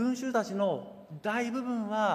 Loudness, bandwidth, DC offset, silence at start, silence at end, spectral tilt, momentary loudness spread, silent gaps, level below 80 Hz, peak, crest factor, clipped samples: -32 LUFS; 15 kHz; under 0.1%; 0 s; 0 s; -5.5 dB/octave; 9 LU; none; -76 dBFS; -16 dBFS; 16 dB; under 0.1%